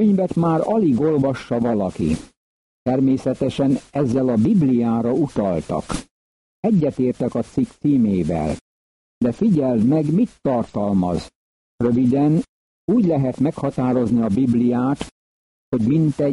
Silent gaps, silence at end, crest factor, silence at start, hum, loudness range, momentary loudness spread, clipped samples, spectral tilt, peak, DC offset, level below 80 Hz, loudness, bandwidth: 2.37-2.86 s, 6.11-6.63 s, 8.61-9.21 s, 11.35-11.78 s, 12.49-12.88 s, 15.11-15.72 s; 0 s; 12 dB; 0 s; none; 2 LU; 8 LU; under 0.1%; -8.5 dB/octave; -8 dBFS; under 0.1%; -46 dBFS; -20 LUFS; 11.5 kHz